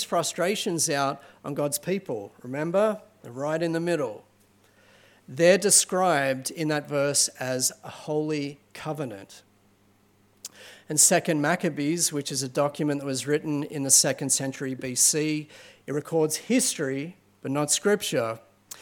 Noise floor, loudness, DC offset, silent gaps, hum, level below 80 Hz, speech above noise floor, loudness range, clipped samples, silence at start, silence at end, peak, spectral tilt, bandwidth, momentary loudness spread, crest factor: -62 dBFS; -24 LUFS; under 0.1%; none; none; -76 dBFS; 36 dB; 6 LU; under 0.1%; 0 s; 0 s; -6 dBFS; -3 dB/octave; 17.5 kHz; 19 LU; 22 dB